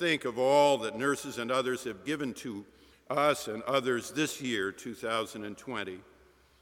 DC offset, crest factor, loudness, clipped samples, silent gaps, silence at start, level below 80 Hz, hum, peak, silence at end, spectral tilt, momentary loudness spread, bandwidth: under 0.1%; 20 dB; -31 LUFS; under 0.1%; none; 0 s; -70 dBFS; none; -10 dBFS; 0.6 s; -4 dB/octave; 13 LU; 18 kHz